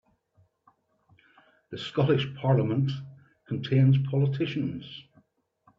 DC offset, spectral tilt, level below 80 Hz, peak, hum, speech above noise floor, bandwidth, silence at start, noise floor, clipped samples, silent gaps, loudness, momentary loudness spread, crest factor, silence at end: under 0.1%; -9 dB/octave; -66 dBFS; -10 dBFS; none; 41 dB; 6 kHz; 1.7 s; -67 dBFS; under 0.1%; none; -27 LUFS; 19 LU; 18 dB; 0.8 s